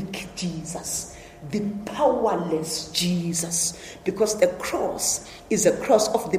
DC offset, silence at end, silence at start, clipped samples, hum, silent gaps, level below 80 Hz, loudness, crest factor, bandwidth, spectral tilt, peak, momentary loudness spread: under 0.1%; 0 s; 0 s; under 0.1%; none; none; -52 dBFS; -24 LUFS; 20 dB; 15.5 kHz; -3.5 dB/octave; -4 dBFS; 10 LU